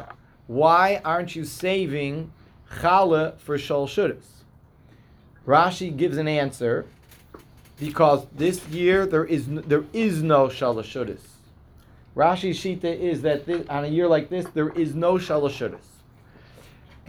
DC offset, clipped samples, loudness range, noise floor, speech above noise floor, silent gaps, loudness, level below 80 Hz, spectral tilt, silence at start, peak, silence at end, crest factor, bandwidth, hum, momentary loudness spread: under 0.1%; under 0.1%; 3 LU; -53 dBFS; 30 dB; none; -23 LUFS; -54 dBFS; -6.5 dB/octave; 0 s; -4 dBFS; 1.3 s; 20 dB; over 20 kHz; none; 13 LU